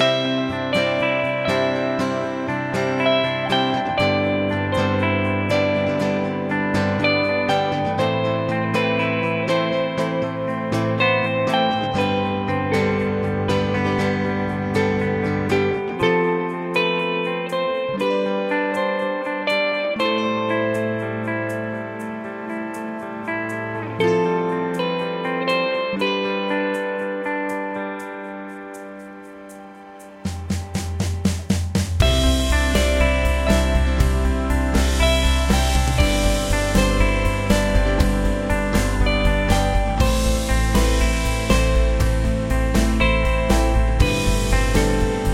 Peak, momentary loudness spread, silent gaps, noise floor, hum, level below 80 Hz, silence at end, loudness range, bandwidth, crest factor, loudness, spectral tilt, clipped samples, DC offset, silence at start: -2 dBFS; 8 LU; none; -40 dBFS; none; -26 dBFS; 0 s; 6 LU; 16 kHz; 18 dB; -21 LUFS; -5.5 dB/octave; under 0.1%; under 0.1%; 0 s